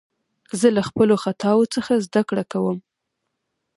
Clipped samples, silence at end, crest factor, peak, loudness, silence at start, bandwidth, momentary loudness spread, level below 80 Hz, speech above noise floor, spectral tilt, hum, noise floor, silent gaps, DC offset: under 0.1%; 0.95 s; 18 dB; -2 dBFS; -20 LUFS; 0.55 s; 11.5 kHz; 7 LU; -60 dBFS; 59 dB; -6 dB/octave; none; -78 dBFS; none; under 0.1%